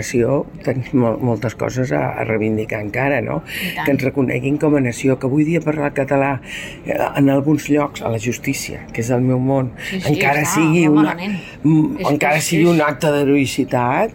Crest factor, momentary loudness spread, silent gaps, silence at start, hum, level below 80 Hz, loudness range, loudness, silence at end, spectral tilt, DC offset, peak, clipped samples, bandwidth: 12 dB; 8 LU; none; 0 s; none; -46 dBFS; 4 LU; -17 LUFS; 0 s; -6 dB/octave; under 0.1%; -4 dBFS; under 0.1%; 17 kHz